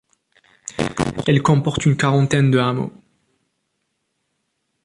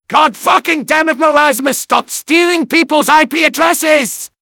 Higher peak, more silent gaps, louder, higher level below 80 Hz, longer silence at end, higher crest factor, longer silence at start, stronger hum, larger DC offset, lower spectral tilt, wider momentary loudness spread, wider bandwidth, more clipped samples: about the same, -2 dBFS vs 0 dBFS; neither; second, -18 LUFS vs -11 LUFS; first, -48 dBFS vs -58 dBFS; first, 1.95 s vs 0.15 s; first, 18 dB vs 12 dB; first, 0.65 s vs 0.1 s; neither; neither; first, -6 dB/octave vs -2 dB/octave; first, 12 LU vs 5 LU; second, 11.5 kHz vs 19 kHz; second, under 0.1% vs 0.7%